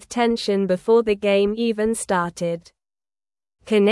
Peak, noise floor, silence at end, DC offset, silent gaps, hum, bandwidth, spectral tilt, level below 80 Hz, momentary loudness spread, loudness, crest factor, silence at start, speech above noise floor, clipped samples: -6 dBFS; under -90 dBFS; 0 s; under 0.1%; none; none; 12 kHz; -5 dB/octave; -54 dBFS; 8 LU; -21 LUFS; 14 dB; 0.1 s; over 70 dB; under 0.1%